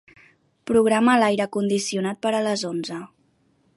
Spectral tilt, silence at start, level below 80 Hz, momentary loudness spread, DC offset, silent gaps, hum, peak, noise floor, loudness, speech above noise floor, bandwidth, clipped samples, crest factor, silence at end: -4.5 dB/octave; 0.65 s; -62 dBFS; 14 LU; under 0.1%; none; none; -4 dBFS; -64 dBFS; -21 LUFS; 43 dB; 11.5 kHz; under 0.1%; 18 dB; 0.7 s